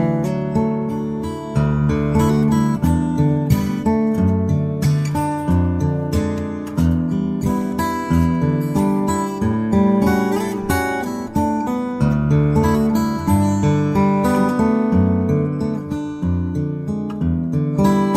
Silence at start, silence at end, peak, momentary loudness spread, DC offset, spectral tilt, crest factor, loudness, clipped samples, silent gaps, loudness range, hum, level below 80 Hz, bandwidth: 0 s; 0 s; -2 dBFS; 7 LU; under 0.1%; -8 dB/octave; 16 dB; -19 LUFS; under 0.1%; none; 3 LU; none; -34 dBFS; 15.5 kHz